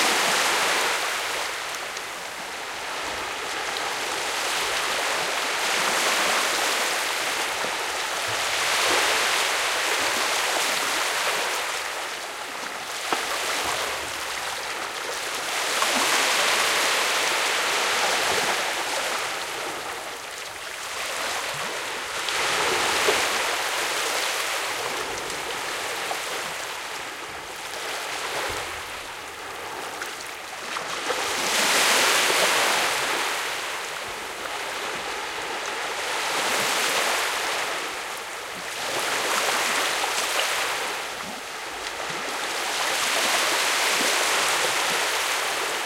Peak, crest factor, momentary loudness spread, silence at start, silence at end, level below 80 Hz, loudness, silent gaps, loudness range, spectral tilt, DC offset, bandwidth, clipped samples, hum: -6 dBFS; 20 dB; 11 LU; 0 s; 0 s; -60 dBFS; -24 LUFS; none; 7 LU; 0.5 dB/octave; under 0.1%; 17 kHz; under 0.1%; none